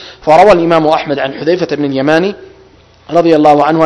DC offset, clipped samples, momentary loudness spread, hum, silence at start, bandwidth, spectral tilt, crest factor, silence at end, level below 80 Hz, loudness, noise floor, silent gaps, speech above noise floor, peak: under 0.1%; 3%; 9 LU; none; 0 s; 11 kHz; -6.5 dB/octave; 10 dB; 0 s; -42 dBFS; -10 LUFS; -42 dBFS; none; 33 dB; 0 dBFS